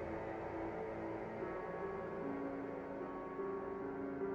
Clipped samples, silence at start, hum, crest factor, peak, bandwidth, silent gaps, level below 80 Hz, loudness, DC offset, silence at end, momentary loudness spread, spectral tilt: under 0.1%; 0 s; none; 12 dB; -32 dBFS; 7.4 kHz; none; -64 dBFS; -44 LUFS; under 0.1%; 0 s; 2 LU; -8.5 dB/octave